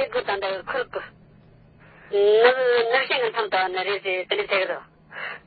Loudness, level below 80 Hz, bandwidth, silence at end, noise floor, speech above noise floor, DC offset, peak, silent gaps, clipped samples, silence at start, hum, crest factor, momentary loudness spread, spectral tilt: -22 LUFS; -64 dBFS; 4.8 kHz; 0.1 s; -52 dBFS; 30 dB; under 0.1%; -4 dBFS; none; under 0.1%; 0 s; none; 20 dB; 17 LU; -7.5 dB/octave